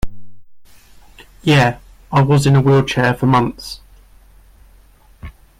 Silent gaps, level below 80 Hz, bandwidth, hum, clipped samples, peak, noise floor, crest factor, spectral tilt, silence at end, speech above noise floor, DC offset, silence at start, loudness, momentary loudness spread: none; -38 dBFS; 14 kHz; none; under 0.1%; -4 dBFS; -47 dBFS; 14 dB; -6.5 dB/octave; 0.3 s; 34 dB; under 0.1%; 0.05 s; -14 LUFS; 20 LU